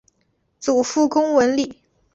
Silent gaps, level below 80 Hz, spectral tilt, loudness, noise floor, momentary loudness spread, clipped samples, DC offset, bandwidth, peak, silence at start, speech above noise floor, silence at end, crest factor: none; -60 dBFS; -3.5 dB/octave; -19 LUFS; -67 dBFS; 10 LU; under 0.1%; under 0.1%; 8.2 kHz; -4 dBFS; 0.6 s; 49 dB; 0.4 s; 16 dB